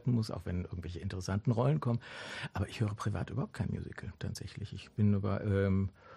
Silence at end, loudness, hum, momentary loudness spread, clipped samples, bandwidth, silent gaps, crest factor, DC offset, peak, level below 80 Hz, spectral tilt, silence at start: 0 s; -35 LUFS; none; 12 LU; under 0.1%; 12 kHz; none; 18 dB; under 0.1%; -18 dBFS; -56 dBFS; -7.5 dB/octave; 0.05 s